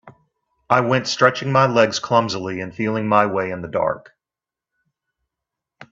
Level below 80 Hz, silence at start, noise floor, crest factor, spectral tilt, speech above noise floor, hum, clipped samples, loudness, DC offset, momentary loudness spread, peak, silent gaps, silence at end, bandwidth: -60 dBFS; 0.05 s; -88 dBFS; 20 dB; -5 dB/octave; 70 dB; none; under 0.1%; -19 LUFS; under 0.1%; 9 LU; 0 dBFS; none; 0.05 s; 7.8 kHz